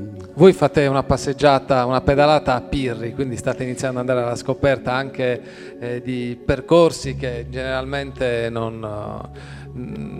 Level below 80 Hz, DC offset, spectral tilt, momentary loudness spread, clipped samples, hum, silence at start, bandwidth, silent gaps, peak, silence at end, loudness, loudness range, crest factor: -40 dBFS; under 0.1%; -6 dB/octave; 16 LU; under 0.1%; none; 0 s; 13 kHz; none; 0 dBFS; 0 s; -20 LUFS; 6 LU; 20 dB